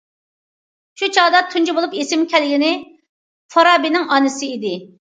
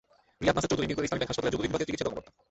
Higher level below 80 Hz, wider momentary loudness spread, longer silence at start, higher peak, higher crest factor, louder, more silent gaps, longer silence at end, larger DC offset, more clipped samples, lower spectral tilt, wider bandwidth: second, -74 dBFS vs -50 dBFS; first, 11 LU vs 6 LU; first, 1 s vs 0.4 s; first, 0 dBFS vs -10 dBFS; about the same, 18 dB vs 20 dB; first, -16 LUFS vs -30 LUFS; first, 3.09-3.49 s vs none; about the same, 0.25 s vs 0.3 s; neither; neither; second, -2.5 dB/octave vs -4.5 dB/octave; first, 9.4 kHz vs 8.4 kHz